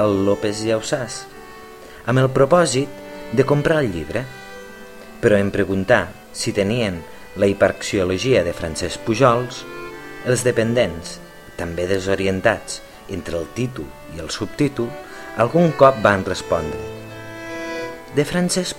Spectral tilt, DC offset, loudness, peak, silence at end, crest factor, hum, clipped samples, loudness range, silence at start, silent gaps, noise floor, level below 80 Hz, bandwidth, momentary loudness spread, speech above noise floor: -5 dB/octave; under 0.1%; -20 LUFS; 0 dBFS; 0 s; 20 dB; none; under 0.1%; 4 LU; 0 s; none; -39 dBFS; -44 dBFS; 16.5 kHz; 18 LU; 20 dB